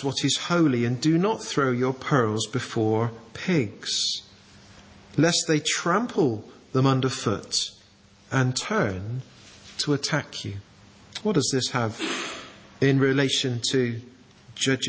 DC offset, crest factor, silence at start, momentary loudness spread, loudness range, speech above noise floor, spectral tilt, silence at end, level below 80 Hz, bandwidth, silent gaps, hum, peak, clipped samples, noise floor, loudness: under 0.1%; 20 dB; 0 s; 12 LU; 4 LU; 30 dB; -4.5 dB/octave; 0 s; -58 dBFS; 8 kHz; none; none; -6 dBFS; under 0.1%; -55 dBFS; -25 LUFS